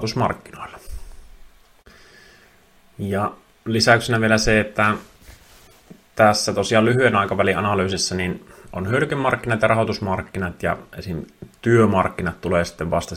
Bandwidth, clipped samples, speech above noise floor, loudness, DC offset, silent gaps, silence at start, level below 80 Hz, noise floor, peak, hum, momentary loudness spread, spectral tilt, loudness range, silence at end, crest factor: 16 kHz; under 0.1%; 33 dB; -20 LUFS; under 0.1%; none; 0 s; -44 dBFS; -53 dBFS; 0 dBFS; none; 18 LU; -5 dB/octave; 5 LU; 0 s; 22 dB